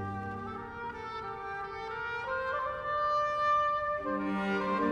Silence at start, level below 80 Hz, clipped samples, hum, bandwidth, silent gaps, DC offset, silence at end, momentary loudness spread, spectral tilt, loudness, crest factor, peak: 0 s; -58 dBFS; under 0.1%; none; 10 kHz; none; under 0.1%; 0 s; 11 LU; -6.5 dB/octave; -33 LUFS; 14 dB; -18 dBFS